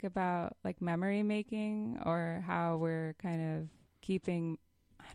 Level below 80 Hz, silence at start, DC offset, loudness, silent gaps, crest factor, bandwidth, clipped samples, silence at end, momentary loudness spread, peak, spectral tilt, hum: -68 dBFS; 0 s; under 0.1%; -37 LUFS; none; 16 dB; 11 kHz; under 0.1%; 0 s; 7 LU; -22 dBFS; -8 dB/octave; none